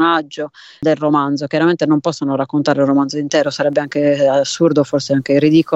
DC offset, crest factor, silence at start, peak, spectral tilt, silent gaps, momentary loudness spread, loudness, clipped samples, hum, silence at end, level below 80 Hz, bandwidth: under 0.1%; 14 dB; 0 s; -2 dBFS; -5.5 dB/octave; none; 5 LU; -15 LUFS; under 0.1%; none; 0 s; -60 dBFS; 8.2 kHz